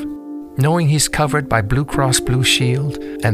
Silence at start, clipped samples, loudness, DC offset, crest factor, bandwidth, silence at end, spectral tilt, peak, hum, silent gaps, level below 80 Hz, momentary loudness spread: 0 s; under 0.1%; -16 LUFS; under 0.1%; 16 dB; 16 kHz; 0 s; -4.5 dB/octave; -2 dBFS; none; none; -36 dBFS; 10 LU